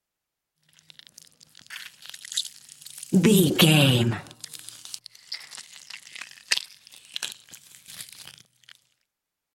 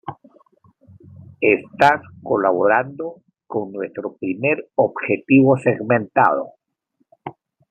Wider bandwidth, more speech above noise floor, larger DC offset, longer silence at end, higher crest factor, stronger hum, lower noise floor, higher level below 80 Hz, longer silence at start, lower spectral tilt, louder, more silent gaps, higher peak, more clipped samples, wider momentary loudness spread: first, 17 kHz vs 8.8 kHz; first, 66 dB vs 50 dB; neither; first, 1.5 s vs 0.4 s; first, 24 dB vs 18 dB; neither; first, -85 dBFS vs -68 dBFS; about the same, -68 dBFS vs -66 dBFS; first, 1.7 s vs 0.05 s; second, -4.5 dB/octave vs -8 dB/octave; second, -22 LUFS vs -19 LUFS; neither; about the same, -4 dBFS vs -2 dBFS; neither; first, 25 LU vs 18 LU